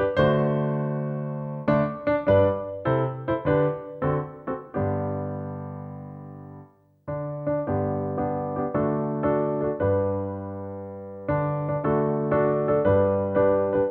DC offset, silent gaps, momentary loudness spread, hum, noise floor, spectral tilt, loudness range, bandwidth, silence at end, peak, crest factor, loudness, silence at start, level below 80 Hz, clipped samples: under 0.1%; none; 14 LU; none; -50 dBFS; -11 dB/octave; 7 LU; 4.6 kHz; 0 s; -8 dBFS; 18 dB; -25 LUFS; 0 s; -50 dBFS; under 0.1%